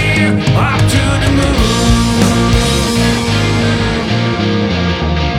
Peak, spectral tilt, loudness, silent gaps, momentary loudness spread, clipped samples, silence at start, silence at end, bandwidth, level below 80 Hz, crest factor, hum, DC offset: 0 dBFS; -5 dB/octave; -12 LUFS; none; 3 LU; under 0.1%; 0 s; 0 s; 15.5 kHz; -20 dBFS; 12 dB; none; under 0.1%